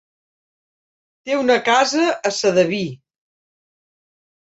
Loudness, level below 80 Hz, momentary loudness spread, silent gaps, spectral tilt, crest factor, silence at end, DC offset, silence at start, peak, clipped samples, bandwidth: -18 LUFS; -66 dBFS; 10 LU; none; -3.5 dB/octave; 18 dB; 1.45 s; under 0.1%; 1.25 s; -2 dBFS; under 0.1%; 8.2 kHz